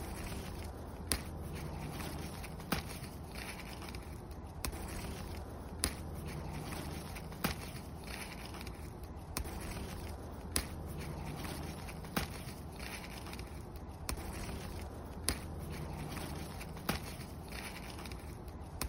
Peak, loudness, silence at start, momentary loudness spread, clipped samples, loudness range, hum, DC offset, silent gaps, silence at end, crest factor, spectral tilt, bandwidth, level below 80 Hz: -10 dBFS; -43 LUFS; 0 s; 8 LU; under 0.1%; 2 LU; none; under 0.1%; none; 0 s; 32 dB; -4 dB/octave; 16 kHz; -48 dBFS